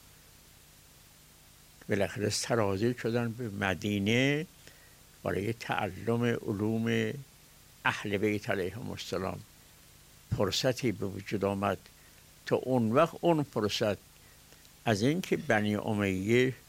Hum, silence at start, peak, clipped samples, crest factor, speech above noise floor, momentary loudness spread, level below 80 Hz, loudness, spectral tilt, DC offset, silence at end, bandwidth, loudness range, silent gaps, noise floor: 50 Hz at -60 dBFS; 1.9 s; -12 dBFS; under 0.1%; 20 dB; 27 dB; 10 LU; -62 dBFS; -31 LUFS; -5.5 dB/octave; under 0.1%; 0.1 s; 16 kHz; 4 LU; none; -57 dBFS